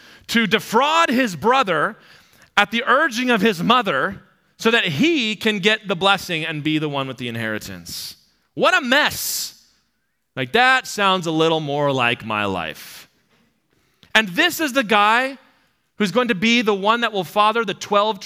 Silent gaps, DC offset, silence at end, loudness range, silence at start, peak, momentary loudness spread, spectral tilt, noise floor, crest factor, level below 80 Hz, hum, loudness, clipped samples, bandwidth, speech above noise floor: none; under 0.1%; 0 s; 3 LU; 0.3 s; 0 dBFS; 11 LU; -3.5 dB/octave; -72 dBFS; 20 dB; -62 dBFS; none; -18 LUFS; under 0.1%; 16.5 kHz; 53 dB